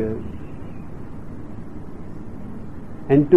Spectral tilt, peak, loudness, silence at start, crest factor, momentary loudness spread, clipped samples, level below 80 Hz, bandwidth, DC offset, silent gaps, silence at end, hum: -10.5 dB/octave; -2 dBFS; -30 LUFS; 0 s; 20 dB; 14 LU; under 0.1%; -42 dBFS; 5.8 kHz; 2%; none; 0 s; none